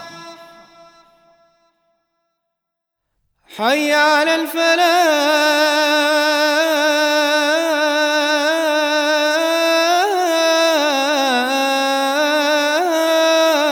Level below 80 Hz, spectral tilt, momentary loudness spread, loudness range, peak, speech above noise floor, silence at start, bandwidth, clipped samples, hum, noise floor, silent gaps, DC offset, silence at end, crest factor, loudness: -70 dBFS; -0.5 dB/octave; 3 LU; 5 LU; -2 dBFS; 64 dB; 0 s; over 20 kHz; under 0.1%; none; -79 dBFS; none; under 0.1%; 0 s; 14 dB; -15 LUFS